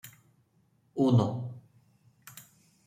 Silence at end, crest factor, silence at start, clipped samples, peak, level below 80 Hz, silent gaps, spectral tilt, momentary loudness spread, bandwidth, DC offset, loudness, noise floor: 0.45 s; 20 dB; 0.05 s; under 0.1%; -12 dBFS; -70 dBFS; none; -8 dB/octave; 26 LU; 16 kHz; under 0.1%; -28 LUFS; -69 dBFS